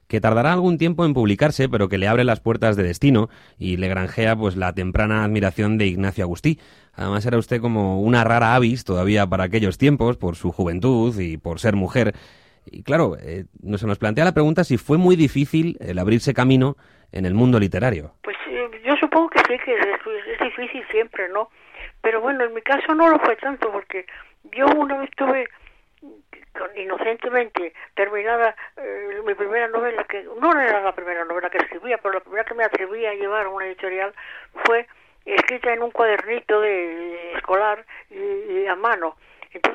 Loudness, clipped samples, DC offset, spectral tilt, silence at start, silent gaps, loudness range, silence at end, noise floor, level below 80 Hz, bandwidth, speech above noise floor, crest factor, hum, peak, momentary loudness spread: -20 LUFS; under 0.1%; under 0.1%; -7 dB/octave; 0.1 s; none; 5 LU; 0 s; -47 dBFS; -44 dBFS; 14 kHz; 27 dB; 16 dB; none; -4 dBFS; 12 LU